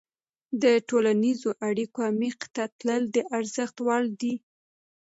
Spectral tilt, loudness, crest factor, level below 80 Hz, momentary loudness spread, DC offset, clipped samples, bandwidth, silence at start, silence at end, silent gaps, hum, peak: -5 dB/octave; -27 LUFS; 18 dB; -78 dBFS; 9 LU; under 0.1%; under 0.1%; 8 kHz; 0.5 s; 0.65 s; 2.72-2.79 s; none; -10 dBFS